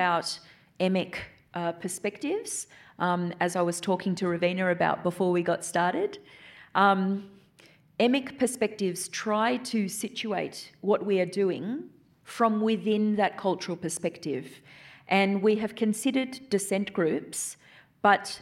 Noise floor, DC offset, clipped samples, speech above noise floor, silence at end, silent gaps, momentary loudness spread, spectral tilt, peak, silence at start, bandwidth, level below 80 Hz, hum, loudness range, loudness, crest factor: -58 dBFS; under 0.1%; under 0.1%; 31 dB; 0 s; none; 11 LU; -4.5 dB/octave; -6 dBFS; 0 s; 15 kHz; -70 dBFS; none; 2 LU; -28 LUFS; 22 dB